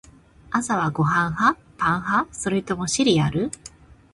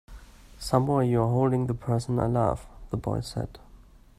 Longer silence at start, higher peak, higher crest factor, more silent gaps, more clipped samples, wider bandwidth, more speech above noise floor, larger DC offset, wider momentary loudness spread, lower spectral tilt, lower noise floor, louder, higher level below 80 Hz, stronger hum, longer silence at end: first, 0.5 s vs 0.1 s; about the same, -4 dBFS vs -6 dBFS; about the same, 18 dB vs 20 dB; neither; neither; second, 11.5 kHz vs 14 kHz; about the same, 26 dB vs 26 dB; neither; second, 8 LU vs 12 LU; second, -4.5 dB/octave vs -7.5 dB/octave; second, -47 dBFS vs -52 dBFS; first, -22 LUFS vs -27 LUFS; about the same, -50 dBFS vs -46 dBFS; neither; second, 0.2 s vs 0.4 s